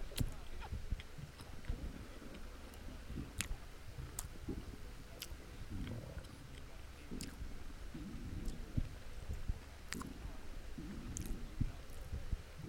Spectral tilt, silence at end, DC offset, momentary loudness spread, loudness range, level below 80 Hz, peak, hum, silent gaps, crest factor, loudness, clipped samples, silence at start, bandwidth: -4.5 dB/octave; 0 s; under 0.1%; 9 LU; 2 LU; -48 dBFS; -16 dBFS; none; none; 28 dB; -49 LUFS; under 0.1%; 0 s; 16.5 kHz